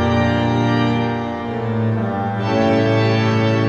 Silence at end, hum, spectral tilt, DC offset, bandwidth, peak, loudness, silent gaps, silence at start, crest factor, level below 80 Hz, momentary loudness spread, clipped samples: 0 s; none; -7.5 dB/octave; under 0.1%; 7.6 kHz; -4 dBFS; -18 LUFS; none; 0 s; 14 dB; -44 dBFS; 6 LU; under 0.1%